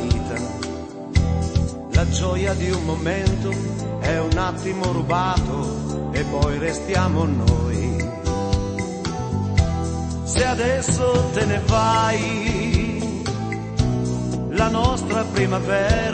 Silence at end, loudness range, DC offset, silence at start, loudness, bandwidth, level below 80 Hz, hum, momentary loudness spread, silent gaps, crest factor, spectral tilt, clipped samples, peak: 0 s; 3 LU; under 0.1%; 0 s; -22 LUFS; 8.8 kHz; -30 dBFS; none; 7 LU; none; 18 dB; -5.5 dB/octave; under 0.1%; -2 dBFS